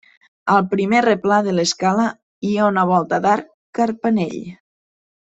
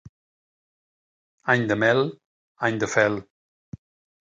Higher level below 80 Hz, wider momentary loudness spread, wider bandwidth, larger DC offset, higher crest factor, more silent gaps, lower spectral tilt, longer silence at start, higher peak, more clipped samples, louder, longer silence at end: about the same, -62 dBFS vs -62 dBFS; about the same, 11 LU vs 10 LU; second, 8.2 kHz vs 9.2 kHz; neither; about the same, 18 dB vs 22 dB; first, 2.22-2.42 s, 3.54-3.73 s vs 2.25-2.55 s; about the same, -5 dB/octave vs -5 dB/octave; second, 0.45 s vs 1.45 s; about the same, -2 dBFS vs -4 dBFS; neither; first, -18 LUFS vs -23 LUFS; second, 0.75 s vs 1 s